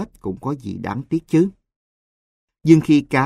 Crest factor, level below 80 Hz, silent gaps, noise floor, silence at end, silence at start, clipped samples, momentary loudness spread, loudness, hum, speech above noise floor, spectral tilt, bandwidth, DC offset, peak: 20 dB; -52 dBFS; 1.76-2.48 s; under -90 dBFS; 0 s; 0 s; under 0.1%; 14 LU; -19 LUFS; none; over 72 dB; -7.5 dB/octave; 11.5 kHz; under 0.1%; 0 dBFS